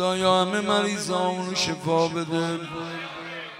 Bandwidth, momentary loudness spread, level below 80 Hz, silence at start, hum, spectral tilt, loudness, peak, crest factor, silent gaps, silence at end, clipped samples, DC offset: 16 kHz; 12 LU; -64 dBFS; 0 s; none; -4 dB/octave; -25 LUFS; -8 dBFS; 18 dB; none; 0 s; under 0.1%; under 0.1%